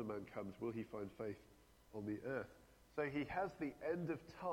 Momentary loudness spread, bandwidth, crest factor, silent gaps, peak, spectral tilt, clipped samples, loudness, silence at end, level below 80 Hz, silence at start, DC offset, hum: 8 LU; 17 kHz; 18 dB; none; -28 dBFS; -7.5 dB/octave; under 0.1%; -46 LUFS; 0 s; -72 dBFS; 0 s; under 0.1%; none